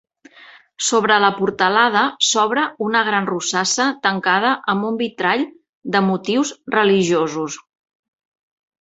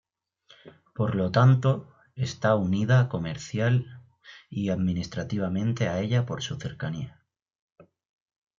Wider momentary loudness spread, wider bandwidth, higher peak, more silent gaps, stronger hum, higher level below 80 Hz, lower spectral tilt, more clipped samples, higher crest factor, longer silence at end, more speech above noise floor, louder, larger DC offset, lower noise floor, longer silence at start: second, 7 LU vs 13 LU; first, 8.4 kHz vs 7.4 kHz; first, -2 dBFS vs -8 dBFS; first, 5.69-5.82 s vs none; neither; about the same, -64 dBFS vs -60 dBFS; second, -3 dB/octave vs -7 dB/octave; neither; about the same, 18 dB vs 20 dB; second, 1.2 s vs 1.5 s; second, 28 dB vs 36 dB; first, -17 LUFS vs -26 LUFS; neither; second, -46 dBFS vs -61 dBFS; first, 0.8 s vs 0.65 s